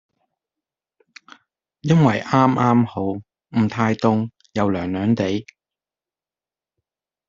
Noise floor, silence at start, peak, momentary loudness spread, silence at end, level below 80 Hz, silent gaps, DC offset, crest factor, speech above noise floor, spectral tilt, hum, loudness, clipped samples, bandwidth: under -90 dBFS; 1.85 s; -2 dBFS; 11 LU; 1.85 s; -58 dBFS; none; under 0.1%; 20 dB; over 72 dB; -7.5 dB/octave; none; -20 LUFS; under 0.1%; 7.6 kHz